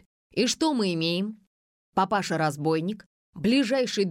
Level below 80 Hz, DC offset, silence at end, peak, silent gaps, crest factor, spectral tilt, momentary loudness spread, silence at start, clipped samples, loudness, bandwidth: -64 dBFS; under 0.1%; 0 s; -12 dBFS; 1.47-1.93 s, 3.06-3.33 s; 16 dB; -4.5 dB/octave; 10 LU; 0.35 s; under 0.1%; -26 LUFS; 16 kHz